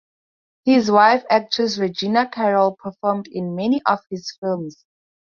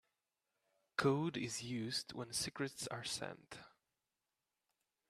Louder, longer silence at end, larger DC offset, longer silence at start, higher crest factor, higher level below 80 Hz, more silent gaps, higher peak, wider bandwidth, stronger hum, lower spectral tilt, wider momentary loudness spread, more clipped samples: first, -19 LUFS vs -41 LUFS; second, 0.7 s vs 1.4 s; neither; second, 0.65 s vs 1 s; about the same, 18 dB vs 22 dB; first, -64 dBFS vs -76 dBFS; first, 4.38-4.42 s vs none; first, -2 dBFS vs -22 dBFS; second, 7.2 kHz vs 14 kHz; neither; first, -5.5 dB/octave vs -4 dB/octave; about the same, 12 LU vs 13 LU; neither